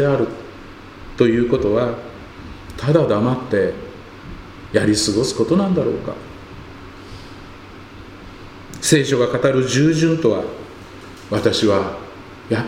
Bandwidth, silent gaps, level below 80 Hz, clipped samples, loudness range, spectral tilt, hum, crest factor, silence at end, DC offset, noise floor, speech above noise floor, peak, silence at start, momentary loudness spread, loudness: 16 kHz; none; -44 dBFS; under 0.1%; 5 LU; -5.5 dB/octave; none; 20 dB; 0 s; under 0.1%; -38 dBFS; 21 dB; 0 dBFS; 0 s; 22 LU; -18 LUFS